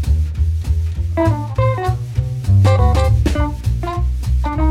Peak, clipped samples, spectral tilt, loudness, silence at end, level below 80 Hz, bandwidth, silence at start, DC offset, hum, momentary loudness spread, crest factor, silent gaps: -2 dBFS; under 0.1%; -7.5 dB/octave; -17 LUFS; 0 s; -20 dBFS; 12.5 kHz; 0 s; under 0.1%; none; 8 LU; 14 dB; none